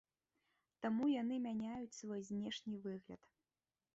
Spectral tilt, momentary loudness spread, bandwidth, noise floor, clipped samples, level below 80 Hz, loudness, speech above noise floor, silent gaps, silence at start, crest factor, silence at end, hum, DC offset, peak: -5 dB/octave; 13 LU; 8 kHz; under -90 dBFS; under 0.1%; -80 dBFS; -43 LUFS; over 48 dB; none; 0.8 s; 16 dB; 0.8 s; none; under 0.1%; -30 dBFS